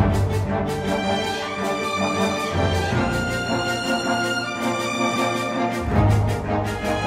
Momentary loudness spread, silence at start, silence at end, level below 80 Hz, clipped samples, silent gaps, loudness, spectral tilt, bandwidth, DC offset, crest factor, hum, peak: 4 LU; 0 s; 0 s; -36 dBFS; under 0.1%; none; -22 LUFS; -5.5 dB/octave; 16 kHz; under 0.1%; 14 dB; none; -6 dBFS